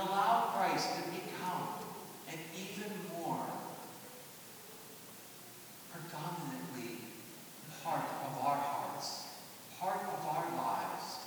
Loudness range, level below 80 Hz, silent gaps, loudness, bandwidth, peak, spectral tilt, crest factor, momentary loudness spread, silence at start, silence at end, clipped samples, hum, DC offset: 8 LU; -86 dBFS; none; -39 LUFS; over 20 kHz; -18 dBFS; -4 dB/octave; 22 dB; 17 LU; 0 s; 0 s; under 0.1%; none; under 0.1%